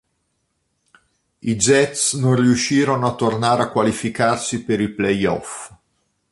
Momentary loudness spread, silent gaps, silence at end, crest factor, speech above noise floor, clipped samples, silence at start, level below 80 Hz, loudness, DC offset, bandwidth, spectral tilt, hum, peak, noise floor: 10 LU; none; 0.6 s; 18 dB; 52 dB; under 0.1%; 1.45 s; -52 dBFS; -18 LUFS; under 0.1%; 11.5 kHz; -4.5 dB/octave; none; -2 dBFS; -70 dBFS